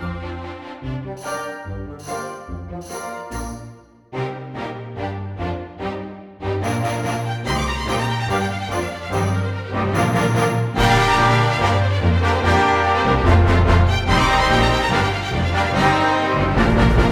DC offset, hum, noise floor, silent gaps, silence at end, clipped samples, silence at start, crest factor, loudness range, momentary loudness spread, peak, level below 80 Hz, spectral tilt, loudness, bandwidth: under 0.1%; none; -41 dBFS; none; 0 s; under 0.1%; 0 s; 18 dB; 14 LU; 15 LU; -2 dBFS; -28 dBFS; -5.5 dB/octave; -19 LUFS; 18 kHz